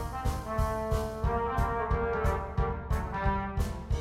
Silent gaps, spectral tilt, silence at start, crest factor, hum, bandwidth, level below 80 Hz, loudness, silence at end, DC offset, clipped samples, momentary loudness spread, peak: none; -7 dB/octave; 0 s; 14 dB; none; 15.5 kHz; -34 dBFS; -32 LUFS; 0 s; under 0.1%; under 0.1%; 4 LU; -16 dBFS